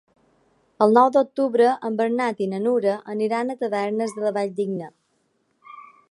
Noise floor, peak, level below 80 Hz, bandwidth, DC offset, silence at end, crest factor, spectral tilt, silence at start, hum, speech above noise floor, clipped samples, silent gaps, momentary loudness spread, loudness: -69 dBFS; -2 dBFS; -74 dBFS; 11.5 kHz; under 0.1%; 0.3 s; 20 dB; -6.5 dB/octave; 0.8 s; none; 48 dB; under 0.1%; none; 9 LU; -22 LUFS